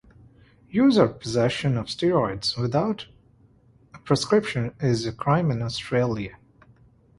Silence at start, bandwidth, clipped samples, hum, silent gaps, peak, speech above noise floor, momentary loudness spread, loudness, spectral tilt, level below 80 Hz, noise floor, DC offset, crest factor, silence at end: 0.7 s; 11.5 kHz; under 0.1%; none; none; -4 dBFS; 34 dB; 8 LU; -24 LUFS; -6 dB/octave; -52 dBFS; -57 dBFS; under 0.1%; 20 dB; 0.85 s